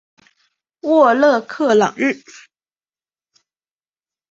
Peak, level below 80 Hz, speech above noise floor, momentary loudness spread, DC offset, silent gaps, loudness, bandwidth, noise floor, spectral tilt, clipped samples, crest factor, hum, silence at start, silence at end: -2 dBFS; -66 dBFS; over 75 dB; 12 LU; under 0.1%; none; -15 LUFS; 7.8 kHz; under -90 dBFS; -5 dB/octave; under 0.1%; 18 dB; none; 0.85 s; 2.15 s